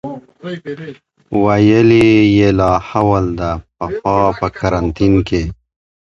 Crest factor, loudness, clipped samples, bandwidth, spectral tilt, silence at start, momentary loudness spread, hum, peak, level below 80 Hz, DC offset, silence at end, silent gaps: 14 dB; -13 LUFS; under 0.1%; 7.8 kHz; -7.5 dB/octave; 0.05 s; 19 LU; none; 0 dBFS; -32 dBFS; under 0.1%; 0.5 s; none